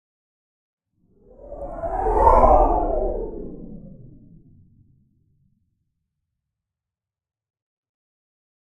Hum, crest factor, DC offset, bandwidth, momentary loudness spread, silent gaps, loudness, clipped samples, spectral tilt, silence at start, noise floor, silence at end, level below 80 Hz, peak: none; 24 dB; under 0.1%; 5.4 kHz; 25 LU; none; -19 LUFS; under 0.1%; -9.5 dB/octave; 1.45 s; -89 dBFS; 4.7 s; -30 dBFS; -2 dBFS